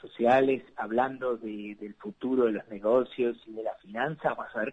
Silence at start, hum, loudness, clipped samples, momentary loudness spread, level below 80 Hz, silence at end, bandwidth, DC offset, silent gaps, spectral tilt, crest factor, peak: 0 s; none; -29 LUFS; under 0.1%; 14 LU; -68 dBFS; 0 s; 8 kHz; under 0.1%; none; -7.5 dB/octave; 18 dB; -12 dBFS